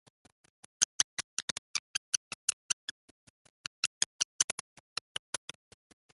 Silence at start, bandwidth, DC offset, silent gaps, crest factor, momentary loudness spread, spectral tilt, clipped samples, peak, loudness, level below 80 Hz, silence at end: 0.8 s; 12 kHz; under 0.1%; 0.85-1.17 s, 1.24-4.19 s, 4.25-4.39 s; 32 dB; 12 LU; 2 dB/octave; under 0.1%; -6 dBFS; -34 LUFS; -76 dBFS; 1.7 s